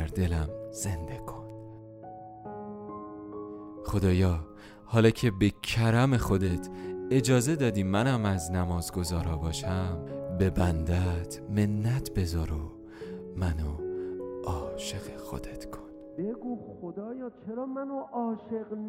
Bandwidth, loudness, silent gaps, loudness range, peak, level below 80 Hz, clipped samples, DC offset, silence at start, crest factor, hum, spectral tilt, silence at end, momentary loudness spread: 16 kHz; -30 LUFS; none; 11 LU; -8 dBFS; -44 dBFS; under 0.1%; under 0.1%; 0 s; 20 dB; none; -6 dB/octave; 0 s; 17 LU